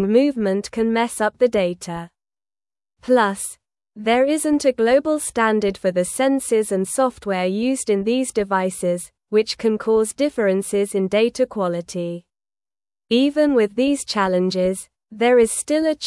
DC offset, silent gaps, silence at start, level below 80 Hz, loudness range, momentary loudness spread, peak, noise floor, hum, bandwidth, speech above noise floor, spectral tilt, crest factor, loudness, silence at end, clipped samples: under 0.1%; none; 0 s; -56 dBFS; 3 LU; 9 LU; -4 dBFS; under -90 dBFS; none; 12 kHz; over 71 dB; -4.5 dB/octave; 16 dB; -20 LUFS; 0 s; under 0.1%